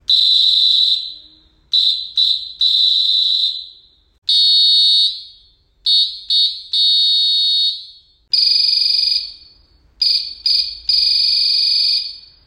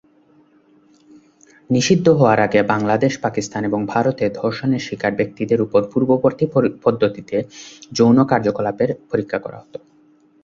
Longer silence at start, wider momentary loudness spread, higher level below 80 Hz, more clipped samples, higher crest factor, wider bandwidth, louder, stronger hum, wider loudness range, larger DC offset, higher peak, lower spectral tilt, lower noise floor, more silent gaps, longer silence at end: second, 0.1 s vs 1.7 s; second, 9 LU vs 12 LU; about the same, -56 dBFS vs -54 dBFS; neither; second, 12 dB vs 18 dB; first, 16.5 kHz vs 7.8 kHz; first, -12 LUFS vs -18 LUFS; neither; about the same, 2 LU vs 2 LU; neither; about the same, -4 dBFS vs -2 dBFS; second, 3 dB/octave vs -6 dB/octave; about the same, -52 dBFS vs -54 dBFS; first, 4.18-4.22 s vs none; second, 0.25 s vs 0.65 s